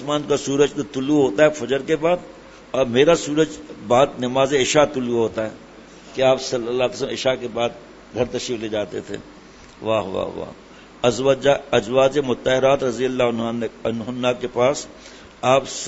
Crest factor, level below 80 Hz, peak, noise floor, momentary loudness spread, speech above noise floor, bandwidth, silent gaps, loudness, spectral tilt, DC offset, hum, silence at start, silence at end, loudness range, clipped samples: 20 dB; -50 dBFS; 0 dBFS; -42 dBFS; 12 LU; 23 dB; 8 kHz; none; -20 LUFS; -4.5 dB/octave; under 0.1%; none; 0 s; 0 s; 6 LU; under 0.1%